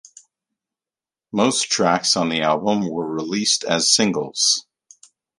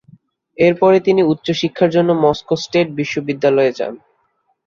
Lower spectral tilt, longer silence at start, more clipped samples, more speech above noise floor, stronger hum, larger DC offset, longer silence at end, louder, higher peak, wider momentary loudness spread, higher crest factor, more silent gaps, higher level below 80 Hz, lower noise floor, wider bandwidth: second, -2.5 dB/octave vs -6.5 dB/octave; first, 1.35 s vs 0.6 s; neither; first, over 70 dB vs 50 dB; neither; neither; about the same, 0.8 s vs 0.7 s; second, -19 LUFS vs -16 LUFS; about the same, -2 dBFS vs -2 dBFS; about the same, 8 LU vs 8 LU; first, 20 dB vs 14 dB; neither; second, -62 dBFS vs -54 dBFS; first, under -90 dBFS vs -64 dBFS; first, 11.5 kHz vs 7.2 kHz